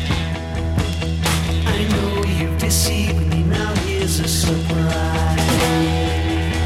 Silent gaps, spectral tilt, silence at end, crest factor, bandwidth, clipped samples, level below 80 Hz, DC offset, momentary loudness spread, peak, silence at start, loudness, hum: none; -5 dB/octave; 0 s; 14 dB; 16 kHz; under 0.1%; -26 dBFS; under 0.1%; 5 LU; -4 dBFS; 0 s; -19 LUFS; none